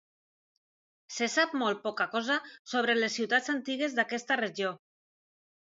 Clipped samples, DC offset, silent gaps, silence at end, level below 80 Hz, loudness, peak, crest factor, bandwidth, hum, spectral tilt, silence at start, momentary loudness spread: under 0.1%; under 0.1%; 2.59-2.65 s; 0.9 s; -86 dBFS; -30 LUFS; -12 dBFS; 20 dB; 7.8 kHz; none; -2.5 dB/octave; 1.1 s; 7 LU